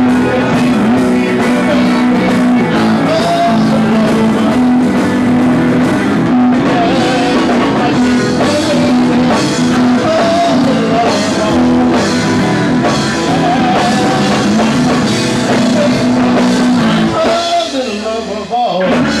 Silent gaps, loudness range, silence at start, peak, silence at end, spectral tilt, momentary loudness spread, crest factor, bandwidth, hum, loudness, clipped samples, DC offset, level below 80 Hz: none; 1 LU; 0 s; -4 dBFS; 0 s; -5.5 dB/octave; 2 LU; 6 dB; 12.5 kHz; none; -11 LUFS; under 0.1%; 0.2%; -40 dBFS